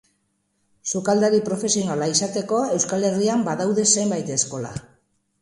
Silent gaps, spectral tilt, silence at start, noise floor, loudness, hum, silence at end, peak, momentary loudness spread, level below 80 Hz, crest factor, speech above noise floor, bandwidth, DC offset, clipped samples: none; -3.5 dB/octave; 0.85 s; -70 dBFS; -21 LUFS; none; 0.6 s; -4 dBFS; 9 LU; -60 dBFS; 18 dB; 49 dB; 11.5 kHz; under 0.1%; under 0.1%